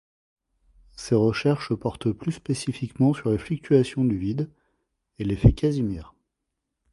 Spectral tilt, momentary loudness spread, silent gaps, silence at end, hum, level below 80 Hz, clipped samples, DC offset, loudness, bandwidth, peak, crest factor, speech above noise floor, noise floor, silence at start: -7.5 dB/octave; 11 LU; none; 0.9 s; none; -40 dBFS; under 0.1%; under 0.1%; -24 LUFS; 11.5 kHz; -2 dBFS; 22 dB; 58 dB; -82 dBFS; 1 s